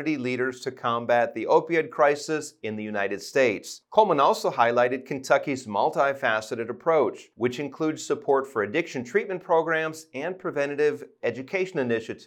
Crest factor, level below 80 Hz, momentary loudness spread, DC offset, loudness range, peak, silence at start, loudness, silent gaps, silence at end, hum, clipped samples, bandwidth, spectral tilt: 20 dB; -80 dBFS; 9 LU; under 0.1%; 3 LU; -4 dBFS; 0 s; -25 LUFS; none; 0 s; none; under 0.1%; 16.5 kHz; -5 dB/octave